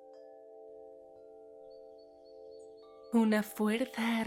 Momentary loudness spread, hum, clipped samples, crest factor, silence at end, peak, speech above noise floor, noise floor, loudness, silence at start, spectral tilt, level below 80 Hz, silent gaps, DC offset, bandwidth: 24 LU; none; under 0.1%; 18 dB; 0 s; -18 dBFS; 24 dB; -55 dBFS; -31 LUFS; 0.05 s; -5.5 dB/octave; -80 dBFS; none; under 0.1%; 16.5 kHz